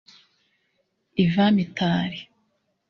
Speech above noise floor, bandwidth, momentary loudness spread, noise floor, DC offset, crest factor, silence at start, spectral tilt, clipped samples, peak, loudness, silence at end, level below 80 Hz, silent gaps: 51 dB; 6.4 kHz; 12 LU; -72 dBFS; under 0.1%; 18 dB; 1.15 s; -7.5 dB/octave; under 0.1%; -8 dBFS; -23 LUFS; 0.65 s; -58 dBFS; none